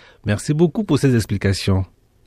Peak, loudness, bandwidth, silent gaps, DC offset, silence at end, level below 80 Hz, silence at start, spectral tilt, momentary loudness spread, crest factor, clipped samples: -4 dBFS; -19 LUFS; 14.5 kHz; none; under 0.1%; 0.4 s; -42 dBFS; 0.25 s; -6.5 dB/octave; 7 LU; 16 dB; under 0.1%